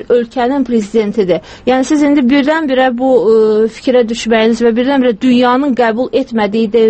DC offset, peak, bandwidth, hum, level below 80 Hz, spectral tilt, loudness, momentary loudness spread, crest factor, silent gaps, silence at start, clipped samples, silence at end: under 0.1%; 0 dBFS; 8.8 kHz; none; -46 dBFS; -5.5 dB/octave; -11 LUFS; 5 LU; 10 dB; none; 0 s; under 0.1%; 0 s